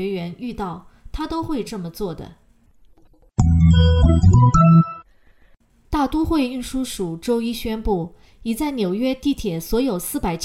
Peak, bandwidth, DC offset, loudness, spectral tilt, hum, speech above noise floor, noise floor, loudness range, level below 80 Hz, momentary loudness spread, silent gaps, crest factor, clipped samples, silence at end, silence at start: -4 dBFS; 15.5 kHz; under 0.1%; -20 LUFS; -7 dB/octave; none; 34 dB; -53 dBFS; 8 LU; -30 dBFS; 16 LU; none; 16 dB; under 0.1%; 0 s; 0 s